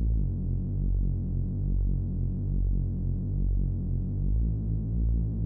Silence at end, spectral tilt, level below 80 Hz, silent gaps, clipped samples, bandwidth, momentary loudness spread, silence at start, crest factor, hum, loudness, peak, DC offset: 0 s; -14.5 dB/octave; -30 dBFS; none; under 0.1%; 1.1 kHz; 2 LU; 0 s; 10 dB; none; -30 LUFS; -18 dBFS; under 0.1%